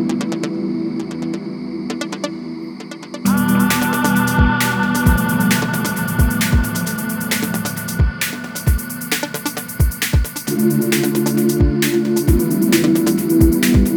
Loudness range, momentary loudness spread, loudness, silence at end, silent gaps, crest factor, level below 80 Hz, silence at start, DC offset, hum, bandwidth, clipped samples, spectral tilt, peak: 5 LU; 10 LU; -17 LUFS; 0 s; none; 16 dB; -26 dBFS; 0 s; under 0.1%; none; over 20 kHz; under 0.1%; -5 dB/octave; 0 dBFS